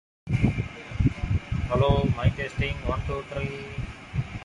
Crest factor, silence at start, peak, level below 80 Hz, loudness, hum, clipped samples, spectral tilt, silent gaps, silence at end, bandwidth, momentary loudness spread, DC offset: 18 dB; 0.25 s; -8 dBFS; -34 dBFS; -28 LUFS; none; under 0.1%; -7.5 dB/octave; none; 0 s; 10.5 kHz; 10 LU; under 0.1%